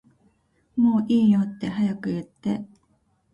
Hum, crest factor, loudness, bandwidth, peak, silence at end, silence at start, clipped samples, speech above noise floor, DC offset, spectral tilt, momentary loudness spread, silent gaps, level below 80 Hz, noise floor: none; 14 dB; -23 LUFS; 8.2 kHz; -10 dBFS; 0.65 s; 0.75 s; under 0.1%; 44 dB; under 0.1%; -8.5 dB/octave; 12 LU; none; -60 dBFS; -66 dBFS